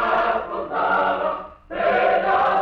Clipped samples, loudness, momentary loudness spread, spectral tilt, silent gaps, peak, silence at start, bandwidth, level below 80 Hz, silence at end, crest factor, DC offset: under 0.1%; -21 LUFS; 8 LU; -6 dB/octave; none; -8 dBFS; 0 s; 6.4 kHz; -50 dBFS; 0 s; 12 dB; under 0.1%